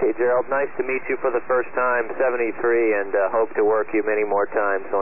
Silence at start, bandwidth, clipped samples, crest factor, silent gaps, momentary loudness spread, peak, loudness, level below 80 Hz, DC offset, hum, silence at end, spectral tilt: 0 s; 2.9 kHz; under 0.1%; 12 dB; none; 3 LU; -10 dBFS; -22 LUFS; -64 dBFS; 2%; none; 0 s; -10.5 dB/octave